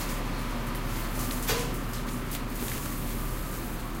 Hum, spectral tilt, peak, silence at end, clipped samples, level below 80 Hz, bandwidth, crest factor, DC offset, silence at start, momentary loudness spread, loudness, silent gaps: none; -4 dB/octave; -14 dBFS; 0 s; under 0.1%; -34 dBFS; 17 kHz; 18 dB; under 0.1%; 0 s; 5 LU; -33 LUFS; none